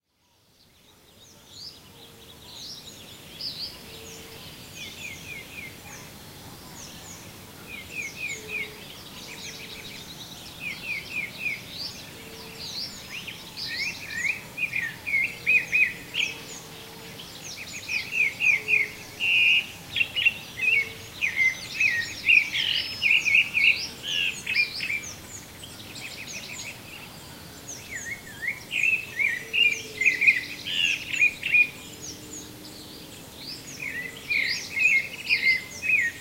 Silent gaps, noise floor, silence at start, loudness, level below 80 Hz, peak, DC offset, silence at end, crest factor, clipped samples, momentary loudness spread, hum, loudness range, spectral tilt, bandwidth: none; -65 dBFS; 1.2 s; -24 LUFS; -60 dBFS; -6 dBFS; under 0.1%; 0 s; 22 dB; under 0.1%; 21 LU; none; 17 LU; -1 dB/octave; 16 kHz